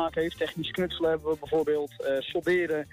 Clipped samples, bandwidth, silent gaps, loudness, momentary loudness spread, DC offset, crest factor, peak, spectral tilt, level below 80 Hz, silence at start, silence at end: under 0.1%; 15.5 kHz; none; -29 LUFS; 4 LU; under 0.1%; 12 dB; -16 dBFS; -5.5 dB/octave; -56 dBFS; 0 s; 0.05 s